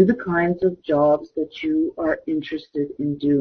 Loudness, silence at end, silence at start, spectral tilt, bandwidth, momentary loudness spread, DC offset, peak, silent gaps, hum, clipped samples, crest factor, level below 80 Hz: -22 LUFS; 0 s; 0 s; -9 dB/octave; 6 kHz; 9 LU; under 0.1%; -4 dBFS; none; none; under 0.1%; 18 dB; -54 dBFS